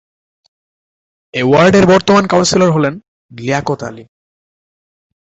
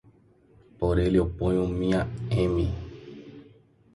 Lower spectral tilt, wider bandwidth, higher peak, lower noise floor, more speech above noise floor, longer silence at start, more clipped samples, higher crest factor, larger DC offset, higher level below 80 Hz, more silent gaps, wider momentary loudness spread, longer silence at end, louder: second, -5 dB/octave vs -8.5 dB/octave; second, 8.2 kHz vs 11.5 kHz; first, 0 dBFS vs -12 dBFS; first, under -90 dBFS vs -58 dBFS; first, over 79 dB vs 34 dB; first, 1.35 s vs 0.8 s; neither; about the same, 14 dB vs 16 dB; neither; second, -46 dBFS vs -38 dBFS; first, 3.08-3.29 s vs none; second, 16 LU vs 21 LU; first, 1.25 s vs 0.55 s; first, -11 LUFS vs -26 LUFS